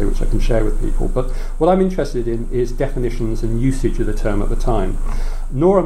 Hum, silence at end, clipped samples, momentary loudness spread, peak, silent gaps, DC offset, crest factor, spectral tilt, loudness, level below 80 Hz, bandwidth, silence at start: none; 0 s; under 0.1%; 8 LU; -2 dBFS; none; under 0.1%; 14 dB; -7.5 dB/octave; -20 LUFS; -18 dBFS; 9.6 kHz; 0 s